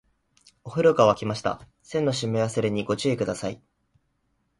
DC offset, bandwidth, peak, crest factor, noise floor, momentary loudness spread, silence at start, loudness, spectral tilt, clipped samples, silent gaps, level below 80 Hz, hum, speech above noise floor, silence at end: under 0.1%; 11.5 kHz; -6 dBFS; 20 dB; -72 dBFS; 14 LU; 0.65 s; -25 LUFS; -5.5 dB/octave; under 0.1%; none; -58 dBFS; none; 48 dB; 1.05 s